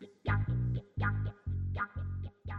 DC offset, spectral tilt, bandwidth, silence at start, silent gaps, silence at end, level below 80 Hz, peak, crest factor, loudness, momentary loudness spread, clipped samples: under 0.1%; -9.5 dB/octave; 4.6 kHz; 0 s; none; 0 s; -46 dBFS; -20 dBFS; 16 dB; -36 LUFS; 7 LU; under 0.1%